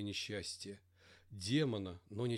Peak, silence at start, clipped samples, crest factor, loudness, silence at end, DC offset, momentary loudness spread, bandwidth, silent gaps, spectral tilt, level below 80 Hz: -22 dBFS; 0 s; under 0.1%; 18 dB; -40 LUFS; 0 s; under 0.1%; 17 LU; 15.5 kHz; none; -5 dB/octave; -72 dBFS